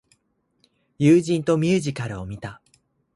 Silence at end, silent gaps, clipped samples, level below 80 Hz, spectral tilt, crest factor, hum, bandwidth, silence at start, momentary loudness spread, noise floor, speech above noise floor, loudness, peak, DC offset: 0.6 s; none; under 0.1%; -54 dBFS; -7 dB/octave; 18 dB; none; 11.5 kHz; 1 s; 17 LU; -70 dBFS; 49 dB; -21 LUFS; -6 dBFS; under 0.1%